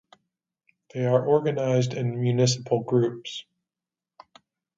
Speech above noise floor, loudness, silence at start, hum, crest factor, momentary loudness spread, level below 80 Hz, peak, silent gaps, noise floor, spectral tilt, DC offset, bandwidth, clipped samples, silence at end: over 66 dB; -24 LUFS; 0.95 s; none; 18 dB; 14 LU; -68 dBFS; -8 dBFS; none; under -90 dBFS; -6 dB/octave; under 0.1%; 7.8 kHz; under 0.1%; 1.35 s